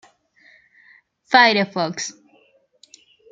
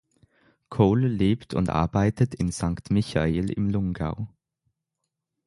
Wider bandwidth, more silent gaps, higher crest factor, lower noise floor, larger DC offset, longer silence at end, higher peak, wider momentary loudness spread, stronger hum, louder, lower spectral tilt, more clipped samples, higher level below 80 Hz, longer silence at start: second, 9.2 kHz vs 11.5 kHz; neither; about the same, 22 dB vs 20 dB; second, -58 dBFS vs -83 dBFS; neither; about the same, 1.2 s vs 1.2 s; first, -2 dBFS vs -6 dBFS; first, 16 LU vs 9 LU; neither; first, -17 LUFS vs -25 LUFS; second, -3 dB/octave vs -7.5 dB/octave; neither; second, -74 dBFS vs -42 dBFS; first, 1.3 s vs 0.7 s